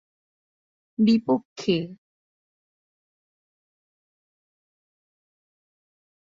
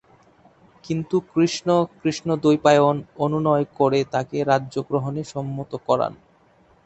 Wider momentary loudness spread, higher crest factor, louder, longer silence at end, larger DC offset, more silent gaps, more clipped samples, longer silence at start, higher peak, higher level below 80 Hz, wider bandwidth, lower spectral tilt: first, 16 LU vs 11 LU; about the same, 20 dB vs 20 dB; about the same, -23 LUFS vs -22 LUFS; first, 4.25 s vs 0.7 s; neither; first, 1.45-1.56 s vs none; neither; first, 1 s vs 0.85 s; second, -10 dBFS vs -2 dBFS; second, -70 dBFS vs -58 dBFS; second, 7.4 kHz vs 8.2 kHz; about the same, -6.5 dB/octave vs -6.5 dB/octave